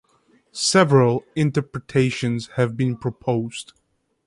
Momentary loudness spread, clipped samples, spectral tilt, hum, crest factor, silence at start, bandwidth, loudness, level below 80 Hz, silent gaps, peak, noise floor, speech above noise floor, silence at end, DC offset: 11 LU; under 0.1%; -5.5 dB/octave; none; 20 dB; 0.55 s; 11.5 kHz; -21 LUFS; -56 dBFS; none; -2 dBFS; -60 dBFS; 40 dB; 0.65 s; under 0.1%